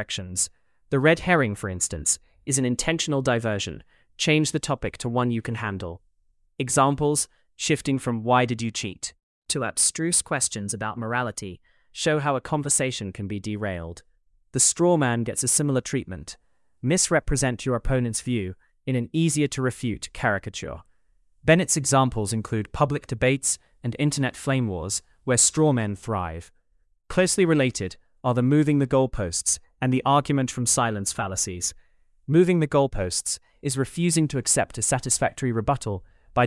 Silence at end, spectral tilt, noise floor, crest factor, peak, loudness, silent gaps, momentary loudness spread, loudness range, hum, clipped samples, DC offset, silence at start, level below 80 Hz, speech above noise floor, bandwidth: 0 s; -4 dB/octave; -66 dBFS; 20 dB; -6 dBFS; -24 LUFS; 9.23-9.42 s; 11 LU; 3 LU; none; under 0.1%; under 0.1%; 0 s; -46 dBFS; 43 dB; 12 kHz